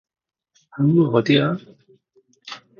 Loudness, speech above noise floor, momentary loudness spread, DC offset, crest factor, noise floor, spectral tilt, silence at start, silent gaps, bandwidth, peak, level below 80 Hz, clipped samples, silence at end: -19 LUFS; 43 dB; 21 LU; under 0.1%; 20 dB; -61 dBFS; -7.5 dB/octave; 0.75 s; none; 7 kHz; -2 dBFS; -62 dBFS; under 0.1%; 0.25 s